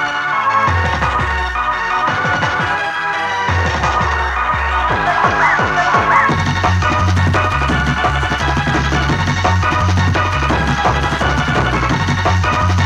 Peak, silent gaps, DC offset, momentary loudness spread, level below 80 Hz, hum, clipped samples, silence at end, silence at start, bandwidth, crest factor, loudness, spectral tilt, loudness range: 0 dBFS; none; under 0.1%; 4 LU; -26 dBFS; none; under 0.1%; 0 s; 0 s; 10.5 kHz; 14 dB; -15 LUFS; -5 dB/octave; 2 LU